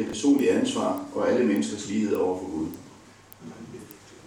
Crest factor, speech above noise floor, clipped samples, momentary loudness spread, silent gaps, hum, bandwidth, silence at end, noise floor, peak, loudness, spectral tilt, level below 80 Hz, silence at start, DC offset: 16 dB; 25 dB; under 0.1%; 22 LU; none; none; 18.5 kHz; 0 s; -50 dBFS; -12 dBFS; -25 LUFS; -5 dB/octave; -62 dBFS; 0 s; under 0.1%